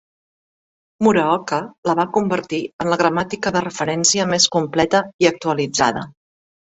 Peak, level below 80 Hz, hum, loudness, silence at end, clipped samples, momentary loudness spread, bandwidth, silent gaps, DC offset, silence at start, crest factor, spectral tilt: 0 dBFS; -54 dBFS; none; -18 LUFS; 0.6 s; under 0.1%; 7 LU; 8.2 kHz; 1.78-1.83 s, 2.73-2.79 s, 5.14-5.19 s; under 0.1%; 1 s; 18 dB; -3.5 dB/octave